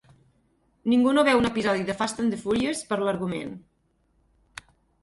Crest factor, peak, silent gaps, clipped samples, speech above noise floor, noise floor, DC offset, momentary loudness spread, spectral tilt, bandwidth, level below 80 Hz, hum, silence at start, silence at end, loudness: 20 dB; -6 dBFS; none; under 0.1%; 44 dB; -68 dBFS; under 0.1%; 25 LU; -5 dB/octave; 11.5 kHz; -56 dBFS; none; 0.85 s; 1.45 s; -24 LUFS